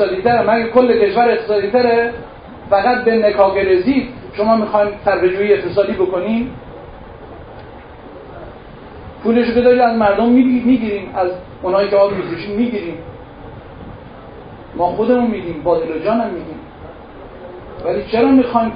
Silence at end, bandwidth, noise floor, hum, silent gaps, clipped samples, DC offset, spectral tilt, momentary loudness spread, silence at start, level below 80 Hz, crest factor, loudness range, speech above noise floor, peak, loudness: 0 s; 5.2 kHz; -35 dBFS; none; none; under 0.1%; under 0.1%; -10 dB/octave; 23 LU; 0 s; -42 dBFS; 16 dB; 7 LU; 21 dB; 0 dBFS; -15 LUFS